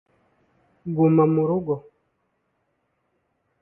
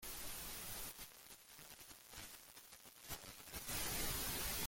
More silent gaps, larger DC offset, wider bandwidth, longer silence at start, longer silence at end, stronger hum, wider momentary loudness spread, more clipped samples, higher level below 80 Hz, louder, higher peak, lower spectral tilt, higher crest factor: neither; neither; second, 2.9 kHz vs 17 kHz; first, 0.85 s vs 0 s; first, 1.8 s vs 0 s; neither; second, 13 LU vs 16 LU; neither; second, -64 dBFS vs -58 dBFS; first, -21 LUFS vs -46 LUFS; first, -6 dBFS vs -30 dBFS; first, -14 dB/octave vs -1.5 dB/octave; about the same, 18 dB vs 18 dB